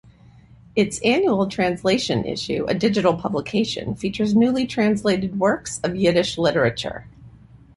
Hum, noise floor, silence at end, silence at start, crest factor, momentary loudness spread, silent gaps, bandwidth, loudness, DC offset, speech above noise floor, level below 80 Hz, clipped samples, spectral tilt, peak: none; -49 dBFS; 0.5 s; 0.75 s; 18 dB; 7 LU; none; 11.5 kHz; -21 LUFS; under 0.1%; 28 dB; -50 dBFS; under 0.1%; -5 dB/octave; -4 dBFS